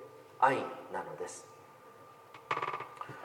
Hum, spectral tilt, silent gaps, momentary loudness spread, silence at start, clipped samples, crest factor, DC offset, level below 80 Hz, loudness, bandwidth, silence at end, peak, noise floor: none; -4 dB/octave; none; 25 LU; 0 s; under 0.1%; 28 dB; under 0.1%; -84 dBFS; -35 LUFS; 17 kHz; 0 s; -10 dBFS; -55 dBFS